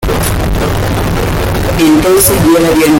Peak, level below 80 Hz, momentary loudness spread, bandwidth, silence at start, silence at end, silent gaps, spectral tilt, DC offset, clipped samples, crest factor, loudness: 0 dBFS; -20 dBFS; 7 LU; 17 kHz; 0 s; 0 s; none; -5 dB/octave; under 0.1%; under 0.1%; 10 dB; -10 LUFS